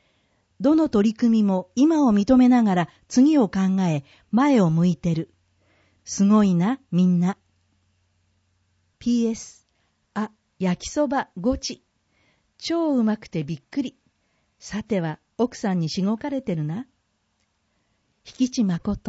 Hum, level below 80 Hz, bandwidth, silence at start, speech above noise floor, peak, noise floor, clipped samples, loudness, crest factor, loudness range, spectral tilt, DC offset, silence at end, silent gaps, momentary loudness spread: none; -52 dBFS; 8 kHz; 0.6 s; 50 dB; -6 dBFS; -71 dBFS; under 0.1%; -22 LUFS; 18 dB; 9 LU; -6.5 dB/octave; under 0.1%; 0.1 s; none; 15 LU